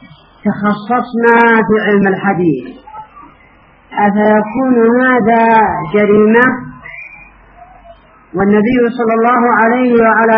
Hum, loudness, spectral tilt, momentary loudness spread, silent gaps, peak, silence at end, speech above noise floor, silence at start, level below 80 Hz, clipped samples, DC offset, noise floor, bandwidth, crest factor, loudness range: none; -11 LUFS; -5.5 dB/octave; 15 LU; none; 0 dBFS; 0 s; 34 dB; 0.45 s; -46 dBFS; under 0.1%; under 0.1%; -44 dBFS; 4.9 kHz; 12 dB; 4 LU